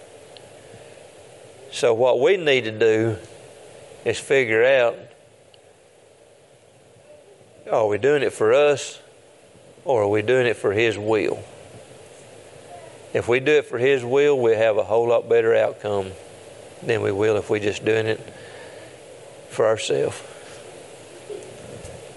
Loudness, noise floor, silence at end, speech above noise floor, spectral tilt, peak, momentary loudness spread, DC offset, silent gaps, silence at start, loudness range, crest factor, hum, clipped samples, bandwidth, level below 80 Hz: -20 LUFS; -52 dBFS; 0 s; 33 dB; -5 dB/octave; -4 dBFS; 24 LU; under 0.1%; none; 0.15 s; 7 LU; 18 dB; none; under 0.1%; 11.5 kHz; -64 dBFS